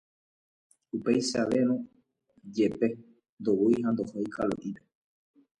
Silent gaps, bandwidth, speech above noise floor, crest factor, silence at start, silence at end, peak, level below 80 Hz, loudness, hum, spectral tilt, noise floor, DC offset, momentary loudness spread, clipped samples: 3.29-3.37 s; 11 kHz; 39 dB; 18 dB; 0.95 s; 0.85 s; -12 dBFS; -66 dBFS; -29 LUFS; none; -5.5 dB/octave; -67 dBFS; under 0.1%; 14 LU; under 0.1%